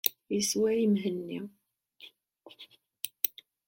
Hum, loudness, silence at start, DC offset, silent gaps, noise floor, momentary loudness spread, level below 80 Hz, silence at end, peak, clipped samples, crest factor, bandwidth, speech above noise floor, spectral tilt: none; -30 LUFS; 0.05 s; under 0.1%; none; -57 dBFS; 25 LU; -76 dBFS; 0.4 s; -4 dBFS; under 0.1%; 28 dB; 17 kHz; 27 dB; -4 dB/octave